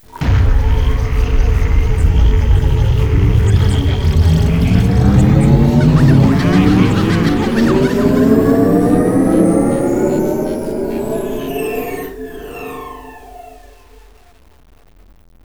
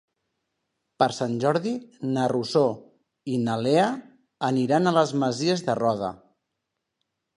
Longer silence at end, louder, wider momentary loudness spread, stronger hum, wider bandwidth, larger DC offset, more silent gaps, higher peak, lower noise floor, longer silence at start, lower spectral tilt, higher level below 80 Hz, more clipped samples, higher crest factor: first, 1.95 s vs 1.2 s; first, -13 LUFS vs -24 LUFS; about the same, 11 LU vs 10 LU; neither; first, 18.5 kHz vs 11 kHz; first, 0.4% vs under 0.1%; neither; first, 0 dBFS vs -6 dBFS; second, -46 dBFS vs -81 dBFS; second, 0.15 s vs 1 s; first, -8 dB/octave vs -6 dB/octave; first, -18 dBFS vs -68 dBFS; neither; second, 12 dB vs 20 dB